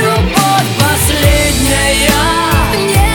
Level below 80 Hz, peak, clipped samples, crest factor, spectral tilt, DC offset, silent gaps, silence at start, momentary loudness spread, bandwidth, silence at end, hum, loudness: -18 dBFS; 0 dBFS; under 0.1%; 10 dB; -4 dB/octave; under 0.1%; none; 0 s; 2 LU; over 20 kHz; 0 s; none; -10 LUFS